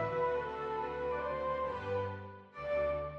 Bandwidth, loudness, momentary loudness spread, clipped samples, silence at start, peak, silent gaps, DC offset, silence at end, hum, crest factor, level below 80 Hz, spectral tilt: 7 kHz; -37 LUFS; 8 LU; under 0.1%; 0 s; -24 dBFS; none; under 0.1%; 0 s; none; 12 dB; -56 dBFS; -7.5 dB/octave